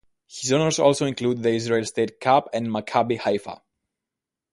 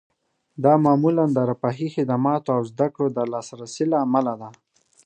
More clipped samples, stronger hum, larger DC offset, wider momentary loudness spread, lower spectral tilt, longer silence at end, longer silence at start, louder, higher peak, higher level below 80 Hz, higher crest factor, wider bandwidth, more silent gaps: neither; neither; neither; about the same, 9 LU vs 10 LU; second, -4.5 dB/octave vs -8 dB/octave; first, 1 s vs 0.55 s; second, 0.3 s vs 0.6 s; about the same, -23 LUFS vs -22 LUFS; about the same, -4 dBFS vs -4 dBFS; first, -62 dBFS vs -70 dBFS; about the same, 20 dB vs 18 dB; first, 11.5 kHz vs 9.2 kHz; neither